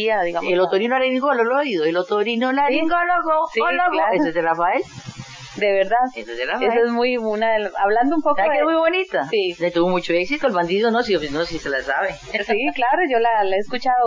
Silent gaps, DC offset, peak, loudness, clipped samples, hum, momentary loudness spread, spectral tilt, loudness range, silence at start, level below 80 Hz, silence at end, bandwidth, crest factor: none; 0.7%; -6 dBFS; -19 LUFS; under 0.1%; none; 6 LU; -5 dB/octave; 2 LU; 0 s; -52 dBFS; 0 s; 7.6 kHz; 14 dB